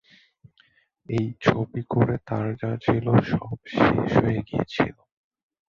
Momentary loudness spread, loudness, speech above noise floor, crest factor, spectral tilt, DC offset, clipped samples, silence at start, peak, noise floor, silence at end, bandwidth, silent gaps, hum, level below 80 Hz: 8 LU; -24 LUFS; 39 dB; 20 dB; -8.5 dB/octave; under 0.1%; under 0.1%; 1.1 s; -4 dBFS; -62 dBFS; 0.75 s; 7.2 kHz; none; none; -48 dBFS